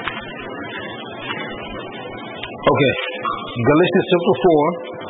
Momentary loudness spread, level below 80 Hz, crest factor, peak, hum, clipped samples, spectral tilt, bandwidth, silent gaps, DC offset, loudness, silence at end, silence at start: 15 LU; -48 dBFS; 16 dB; -4 dBFS; none; under 0.1%; -11 dB/octave; 4 kHz; none; under 0.1%; -19 LUFS; 0 s; 0 s